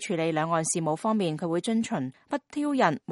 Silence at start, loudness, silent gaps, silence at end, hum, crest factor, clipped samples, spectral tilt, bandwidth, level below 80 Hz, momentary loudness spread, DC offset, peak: 0 s; -28 LUFS; none; 0 s; none; 20 dB; under 0.1%; -5 dB/octave; 11.5 kHz; -72 dBFS; 8 LU; under 0.1%; -8 dBFS